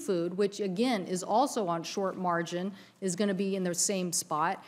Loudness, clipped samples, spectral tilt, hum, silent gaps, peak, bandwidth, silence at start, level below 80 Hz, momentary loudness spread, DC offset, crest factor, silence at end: -31 LUFS; under 0.1%; -4 dB/octave; none; none; -16 dBFS; 16 kHz; 0 s; -84 dBFS; 7 LU; under 0.1%; 16 dB; 0 s